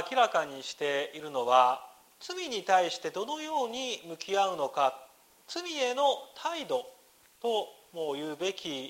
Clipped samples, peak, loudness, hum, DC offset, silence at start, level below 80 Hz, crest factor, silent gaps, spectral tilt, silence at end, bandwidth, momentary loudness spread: under 0.1%; -10 dBFS; -31 LUFS; none; under 0.1%; 0 s; -80 dBFS; 22 dB; none; -2 dB/octave; 0 s; 16 kHz; 11 LU